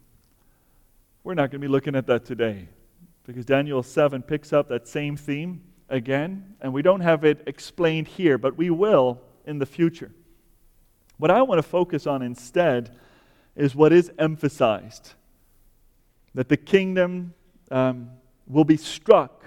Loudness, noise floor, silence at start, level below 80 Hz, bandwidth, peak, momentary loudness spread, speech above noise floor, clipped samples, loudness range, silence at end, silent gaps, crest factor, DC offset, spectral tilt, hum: -23 LUFS; -60 dBFS; 1.25 s; -58 dBFS; 16 kHz; -2 dBFS; 17 LU; 39 dB; under 0.1%; 4 LU; 0.2 s; none; 22 dB; under 0.1%; -7 dB/octave; none